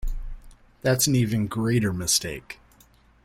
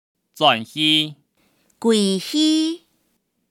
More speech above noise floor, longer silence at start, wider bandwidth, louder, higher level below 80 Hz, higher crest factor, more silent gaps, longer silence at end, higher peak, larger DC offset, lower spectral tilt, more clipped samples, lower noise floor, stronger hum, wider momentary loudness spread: second, 33 dB vs 51 dB; second, 0 s vs 0.35 s; about the same, 16.5 kHz vs 15.5 kHz; second, -23 LUFS vs -19 LUFS; first, -38 dBFS vs -80 dBFS; about the same, 18 dB vs 18 dB; neither; about the same, 0.7 s vs 0.75 s; second, -8 dBFS vs -2 dBFS; neither; about the same, -4 dB/octave vs -3.5 dB/octave; neither; second, -57 dBFS vs -69 dBFS; neither; first, 22 LU vs 9 LU